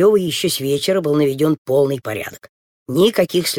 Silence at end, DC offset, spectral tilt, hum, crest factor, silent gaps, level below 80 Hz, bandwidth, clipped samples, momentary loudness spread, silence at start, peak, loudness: 0 s; under 0.1%; -5 dB/octave; none; 14 dB; 1.58-1.65 s, 2.49-2.86 s; -58 dBFS; 18.5 kHz; under 0.1%; 9 LU; 0 s; -4 dBFS; -17 LUFS